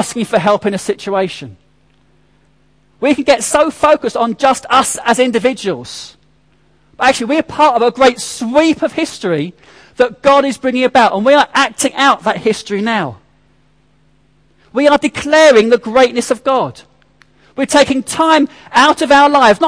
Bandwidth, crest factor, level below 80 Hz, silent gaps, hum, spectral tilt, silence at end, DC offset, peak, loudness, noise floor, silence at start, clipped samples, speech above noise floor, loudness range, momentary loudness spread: 11 kHz; 14 dB; -48 dBFS; none; none; -3.5 dB/octave; 0 s; 0.1%; 0 dBFS; -12 LUFS; -54 dBFS; 0 s; under 0.1%; 42 dB; 4 LU; 10 LU